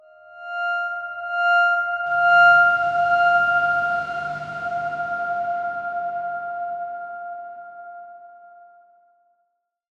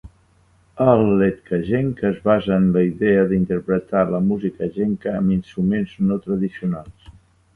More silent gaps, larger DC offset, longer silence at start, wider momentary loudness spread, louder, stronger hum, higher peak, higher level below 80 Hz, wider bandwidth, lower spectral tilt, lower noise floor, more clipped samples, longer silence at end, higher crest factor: neither; neither; first, 0.25 s vs 0.05 s; first, 20 LU vs 7 LU; about the same, -20 LUFS vs -20 LUFS; neither; second, -6 dBFS vs 0 dBFS; second, -66 dBFS vs -46 dBFS; first, 7.4 kHz vs 3.8 kHz; second, -4 dB/octave vs -10 dB/octave; first, -73 dBFS vs -57 dBFS; neither; first, 1.5 s vs 0.45 s; about the same, 16 dB vs 18 dB